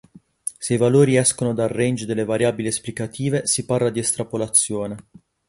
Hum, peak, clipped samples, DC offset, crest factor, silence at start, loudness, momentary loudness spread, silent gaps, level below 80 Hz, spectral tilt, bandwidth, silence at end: none; -2 dBFS; under 0.1%; under 0.1%; 20 dB; 0.45 s; -20 LUFS; 13 LU; none; -56 dBFS; -4.5 dB/octave; 12 kHz; 0.5 s